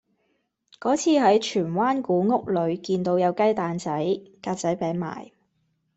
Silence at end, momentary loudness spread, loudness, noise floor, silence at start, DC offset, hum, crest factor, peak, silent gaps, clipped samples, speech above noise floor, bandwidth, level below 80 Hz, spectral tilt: 0.7 s; 10 LU; -24 LUFS; -72 dBFS; 0.8 s; under 0.1%; none; 18 dB; -6 dBFS; none; under 0.1%; 49 dB; 8.2 kHz; -66 dBFS; -5.5 dB/octave